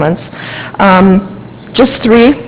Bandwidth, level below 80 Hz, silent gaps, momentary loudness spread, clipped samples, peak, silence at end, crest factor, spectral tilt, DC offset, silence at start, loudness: 4 kHz; -36 dBFS; none; 16 LU; 2%; 0 dBFS; 0 s; 10 dB; -10.5 dB/octave; under 0.1%; 0 s; -9 LUFS